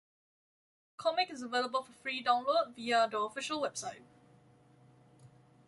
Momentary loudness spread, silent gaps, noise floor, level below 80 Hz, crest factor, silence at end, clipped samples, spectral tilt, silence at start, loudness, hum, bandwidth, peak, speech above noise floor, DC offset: 8 LU; none; -63 dBFS; -82 dBFS; 20 dB; 0.4 s; under 0.1%; -2 dB/octave; 1 s; -34 LUFS; none; 11.5 kHz; -16 dBFS; 29 dB; under 0.1%